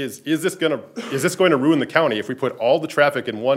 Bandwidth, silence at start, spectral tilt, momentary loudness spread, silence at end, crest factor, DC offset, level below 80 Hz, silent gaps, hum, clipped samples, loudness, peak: 16 kHz; 0 s; -5 dB/octave; 7 LU; 0 s; 20 dB; under 0.1%; -72 dBFS; none; none; under 0.1%; -20 LUFS; 0 dBFS